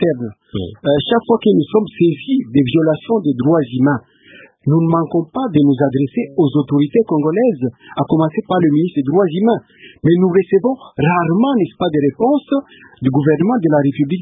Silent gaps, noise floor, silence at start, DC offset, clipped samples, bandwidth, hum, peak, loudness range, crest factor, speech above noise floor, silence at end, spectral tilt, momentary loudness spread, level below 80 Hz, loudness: none; -44 dBFS; 0 s; under 0.1%; under 0.1%; 3.9 kHz; none; 0 dBFS; 1 LU; 14 dB; 29 dB; 0 s; -13 dB/octave; 7 LU; -50 dBFS; -15 LUFS